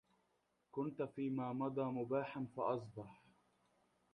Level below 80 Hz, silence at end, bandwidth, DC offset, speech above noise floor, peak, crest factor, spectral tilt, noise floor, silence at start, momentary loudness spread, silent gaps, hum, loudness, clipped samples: -80 dBFS; 0.95 s; 9.2 kHz; under 0.1%; 40 dB; -26 dBFS; 18 dB; -9 dB/octave; -82 dBFS; 0.75 s; 11 LU; none; none; -43 LUFS; under 0.1%